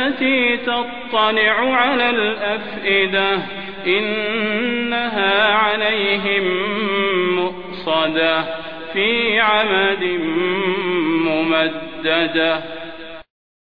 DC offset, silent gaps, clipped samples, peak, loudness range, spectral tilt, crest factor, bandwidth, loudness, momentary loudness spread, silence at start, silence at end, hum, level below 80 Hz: 1%; none; under 0.1%; -2 dBFS; 2 LU; -7 dB/octave; 16 dB; 5.2 kHz; -17 LUFS; 9 LU; 0 s; 0.4 s; none; -54 dBFS